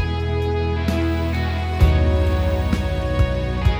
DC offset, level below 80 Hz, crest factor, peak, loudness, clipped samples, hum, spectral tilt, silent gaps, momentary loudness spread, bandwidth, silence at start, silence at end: under 0.1%; -22 dBFS; 16 dB; -2 dBFS; -21 LUFS; under 0.1%; none; -7.5 dB/octave; none; 5 LU; 12 kHz; 0 s; 0 s